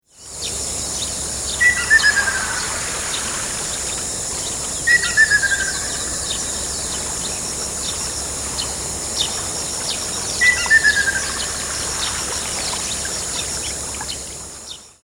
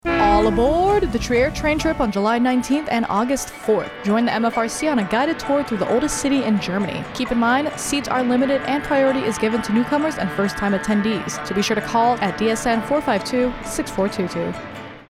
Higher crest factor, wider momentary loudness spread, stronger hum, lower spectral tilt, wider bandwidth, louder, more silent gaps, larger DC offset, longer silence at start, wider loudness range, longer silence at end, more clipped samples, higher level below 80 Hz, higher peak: about the same, 18 dB vs 14 dB; first, 10 LU vs 6 LU; neither; second, -0.5 dB/octave vs -4.5 dB/octave; about the same, 16.5 kHz vs 15.5 kHz; about the same, -18 LUFS vs -20 LUFS; neither; neither; first, 0.2 s vs 0.05 s; first, 4 LU vs 1 LU; about the same, 0.15 s vs 0.1 s; neither; about the same, -40 dBFS vs -38 dBFS; first, -2 dBFS vs -6 dBFS